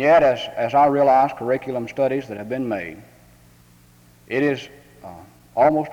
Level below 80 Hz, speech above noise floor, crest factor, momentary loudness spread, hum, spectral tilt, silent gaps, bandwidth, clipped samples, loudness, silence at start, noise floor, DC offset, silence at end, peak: -56 dBFS; 32 dB; 16 dB; 18 LU; none; -6.5 dB/octave; none; 19 kHz; under 0.1%; -20 LUFS; 0 s; -52 dBFS; under 0.1%; 0 s; -4 dBFS